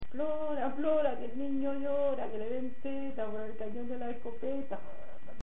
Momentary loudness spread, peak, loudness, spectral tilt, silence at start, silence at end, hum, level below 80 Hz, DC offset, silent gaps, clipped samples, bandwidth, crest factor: 10 LU; -18 dBFS; -36 LUFS; -3.5 dB/octave; 0 s; 0 s; none; -60 dBFS; 3%; none; under 0.1%; 3.9 kHz; 16 dB